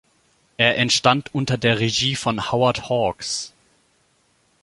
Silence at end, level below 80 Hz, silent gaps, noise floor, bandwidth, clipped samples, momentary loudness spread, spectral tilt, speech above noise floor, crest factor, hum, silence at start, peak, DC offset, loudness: 1.15 s; -52 dBFS; none; -63 dBFS; 11.5 kHz; under 0.1%; 9 LU; -4 dB/octave; 43 dB; 22 dB; none; 0.6 s; 0 dBFS; under 0.1%; -20 LUFS